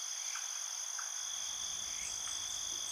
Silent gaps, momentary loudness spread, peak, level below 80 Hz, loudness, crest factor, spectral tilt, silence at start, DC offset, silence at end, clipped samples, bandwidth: none; 1 LU; -26 dBFS; -70 dBFS; -38 LUFS; 14 dB; 2.5 dB/octave; 0 s; under 0.1%; 0 s; under 0.1%; over 20 kHz